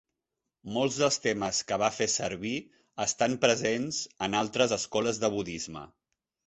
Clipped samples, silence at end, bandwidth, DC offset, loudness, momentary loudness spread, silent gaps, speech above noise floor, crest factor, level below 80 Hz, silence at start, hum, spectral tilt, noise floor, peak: under 0.1%; 0.6 s; 8.4 kHz; under 0.1%; -29 LUFS; 11 LU; none; 57 dB; 22 dB; -62 dBFS; 0.65 s; none; -3 dB/octave; -86 dBFS; -8 dBFS